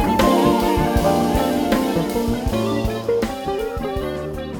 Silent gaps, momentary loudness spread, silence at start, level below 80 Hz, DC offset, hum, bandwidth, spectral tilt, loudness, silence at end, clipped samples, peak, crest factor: none; 9 LU; 0 s; -32 dBFS; under 0.1%; none; 19 kHz; -6 dB/octave; -20 LUFS; 0 s; under 0.1%; -4 dBFS; 16 dB